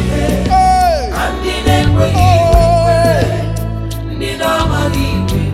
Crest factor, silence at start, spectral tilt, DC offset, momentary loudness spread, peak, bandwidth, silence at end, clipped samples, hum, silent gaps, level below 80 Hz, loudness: 12 dB; 0 s; -6 dB/octave; under 0.1%; 10 LU; 0 dBFS; 15.5 kHz; 0 s; 0.2%; none; none; -20 dBFS; -13 LUFS